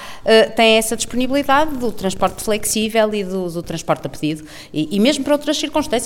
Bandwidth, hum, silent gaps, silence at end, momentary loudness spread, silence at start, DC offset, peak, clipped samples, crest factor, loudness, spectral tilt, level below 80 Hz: 17.5 kHz; none; none; 0 s; 11 LU; 0 s; under 0.1%; 0 dBFS; under 0.1%; 16 dB; -17 LUFS; -3.5 dB/octave; -42 dBFS